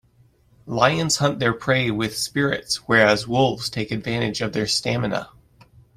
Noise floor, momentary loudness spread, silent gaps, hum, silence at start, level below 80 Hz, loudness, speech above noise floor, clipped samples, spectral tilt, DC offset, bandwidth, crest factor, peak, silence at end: -57 dBFS; 9 LU; none; none; 0.65 s; -52 dBFS; -21 LUFS; 36 dB; under 0.1%; -4 dB/octave; under 0.1%; 15.5 kHz; 20 dB; -2 dBFS; 0.7 s